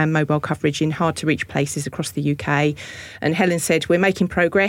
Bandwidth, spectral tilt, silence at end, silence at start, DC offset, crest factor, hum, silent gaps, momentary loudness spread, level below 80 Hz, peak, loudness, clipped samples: 17 kHz; -5.5 dB/octave; 0 s; 0 s; under 0.1%; 14 dB; none; none; 7 LU; -50 dBFS; -6 dBFS; -20 LUFS; under 0.1%